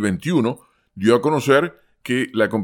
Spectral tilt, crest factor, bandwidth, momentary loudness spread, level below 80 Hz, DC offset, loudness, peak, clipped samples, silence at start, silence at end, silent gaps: -6 dB/octave; 18 dB; 17.5 kHz; 11 LU; -60 dBFS; under 0.1%; -19 LUFS; -2 dBFS; under 0.1%; 0 s; 0 s; none